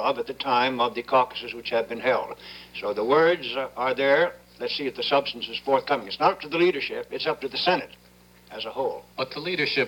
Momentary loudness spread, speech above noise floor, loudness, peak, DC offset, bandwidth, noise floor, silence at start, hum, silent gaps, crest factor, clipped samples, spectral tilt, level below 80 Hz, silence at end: 11 LU; 29 dB; -25 LUFS; -8 dBFS; under 0.1%; over 20 kHz; -54 dBFS; 0 s; none; none; 18 dB; under 0.1%; -5 dB/octave; -62 dBFS; 0 s